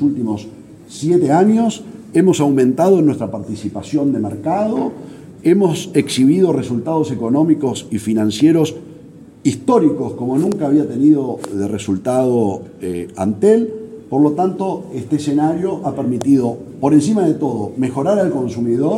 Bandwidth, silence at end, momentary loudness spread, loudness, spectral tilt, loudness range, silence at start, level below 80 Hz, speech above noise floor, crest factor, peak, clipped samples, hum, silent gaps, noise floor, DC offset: 13 kHz; 0 s; 11 LU; -16 LUFS; -7 dB/octave; 2 LU; 0 s; -56 dBFS; 24 dB; 14 dB; -2 dBFS; under 0.1%; none; none; -39 dBFS; under 0.1%